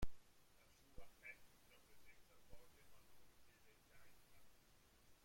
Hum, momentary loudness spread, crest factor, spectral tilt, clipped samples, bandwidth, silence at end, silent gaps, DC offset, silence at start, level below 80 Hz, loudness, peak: none; 10 LU; 24 dB; -4.5 dB/octave; under 0.1%; 16.5 kHz; 0 s; none; under 0.1%; 0 s; -64 dBFS; -63 LUFS; -30 dBFS